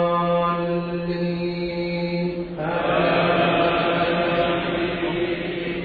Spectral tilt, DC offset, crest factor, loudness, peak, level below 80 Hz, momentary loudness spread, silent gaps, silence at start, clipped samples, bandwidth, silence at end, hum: -9 dB/octave; under 0.1%; 14 dB; -22 LUFS; -8 dBFS; -46 dBFS; 7 LU; none; 0 s; under 0.1%; 4.8 kHz; 0 s; none